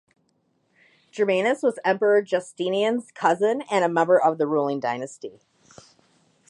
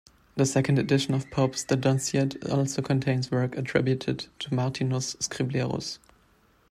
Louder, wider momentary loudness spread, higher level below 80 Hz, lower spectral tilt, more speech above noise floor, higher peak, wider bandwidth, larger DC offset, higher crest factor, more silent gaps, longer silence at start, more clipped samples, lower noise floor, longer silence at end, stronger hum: first, -22 LUFS vs -27 LUFS; first, 11 LU vs 7 LU; second, -78 dBFS vs -60 dBFS; about the same, -5 dB/octave vs -5.5 dB/octave; first, 46 dB vs 36 dB; first, -6 dBFS vs -10 dBFS; second, 11 kHz vs 13.5 kHz; neither; about the same, 18 dB vs 18 dB; neither; first, 1.15 s vs 0.35 s; neither; first, -69 dBFS vs -63 dBFS; first, 1.2 s vs 0.75 s; neither